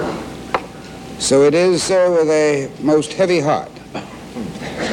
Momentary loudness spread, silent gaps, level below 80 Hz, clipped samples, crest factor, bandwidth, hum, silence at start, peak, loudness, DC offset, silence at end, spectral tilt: 18 LU; none; -48 dBFS; under 0.1%; 16 dB; 15.5 kHz; none; 0 s; 0 dBFS; -16 LUFS; under 0.1%; 0 s; -4.5 dB/octave